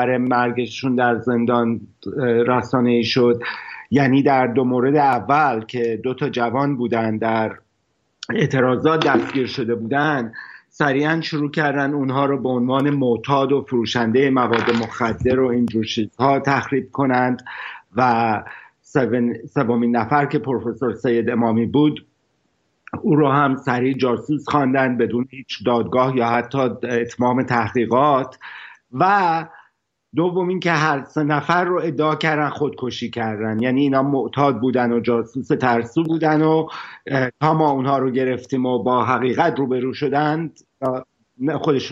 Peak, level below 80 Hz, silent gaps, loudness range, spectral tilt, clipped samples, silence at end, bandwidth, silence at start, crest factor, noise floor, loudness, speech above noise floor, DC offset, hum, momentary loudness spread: -2 dBFS; -56 dBFS; none; 2 LU; -7 dB/octave; under 0.1%; 0 s; 7.6 kHz; 0 s; 18 dB; -68 dBFS; -19 LUFS; 49 dB; under 0.1%; none; 8 LU